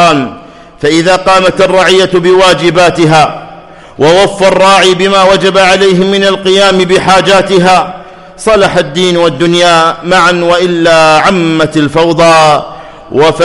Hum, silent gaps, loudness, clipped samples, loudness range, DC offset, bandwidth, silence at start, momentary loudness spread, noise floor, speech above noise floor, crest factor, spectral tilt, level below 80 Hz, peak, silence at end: none; none; -6 LUFS; 0.5%; 2 LU; 0.3%; 11.5 kHz; 0 s; 5 LU; -30 dBFS; 24 dB; 6 dB; -4.5 dB/octave; -36 dBFS; 0 dBFS; 0 s